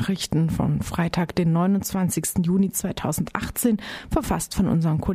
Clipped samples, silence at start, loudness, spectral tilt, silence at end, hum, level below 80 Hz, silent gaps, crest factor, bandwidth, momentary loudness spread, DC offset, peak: under 0.1%; 0 s; -23 LUFS; -5.5 dB/octave; 0 s; none; -40 dBFS; none; 16 dB; 15.5 kHz; 5 LU; under 0.1%; -6 dBFS